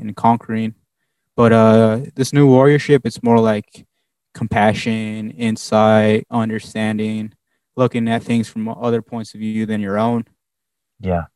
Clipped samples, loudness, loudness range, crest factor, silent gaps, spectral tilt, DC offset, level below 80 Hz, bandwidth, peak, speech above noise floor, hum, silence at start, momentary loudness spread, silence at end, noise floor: under 0.1%; -16 LUFS; 7 LU; 16 dB; none; -7 dB/octave; under 0.1%; -50 dBFS; 12 kHz; 0 dBFS; 65 dB; none; 0 s; 14 LU; 0.1 s; -81 dBFS